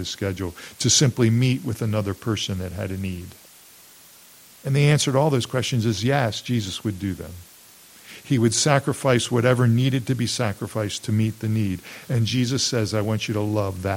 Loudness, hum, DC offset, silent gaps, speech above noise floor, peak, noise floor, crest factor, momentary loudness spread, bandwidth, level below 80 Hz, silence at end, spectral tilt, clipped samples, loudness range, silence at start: -22 LUFS; none; under 0.1%; none; 27 dB; -2 dBFS; -49 dBFS; 20 dB; 12 LU; 17 kHz; -56 dBFS; 0 s; -5 dB/octave; under 0.1%; 4 LU; 0 s